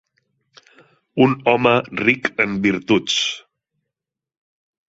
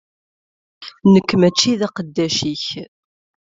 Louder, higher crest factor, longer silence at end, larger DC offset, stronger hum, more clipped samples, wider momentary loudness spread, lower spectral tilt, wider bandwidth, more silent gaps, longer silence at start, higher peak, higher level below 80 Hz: about the same, -18 LUFS vs -17 LUFS; about the same, 20 dB vs 18 dB; first, 1.5 s vs 0.65 s; neither; neither; neither; second, 6 LU vs 17 LU; about the same, -4.5 dB/octave vs -5 dB/octave; about the same, 8 kHz vs 7.8 kHz; neither; first, 1.15 s vs 0.8 s; about the same, -2 dBFS vs -2 dBFS; about the same, -58 dBFS vs -56 dBFS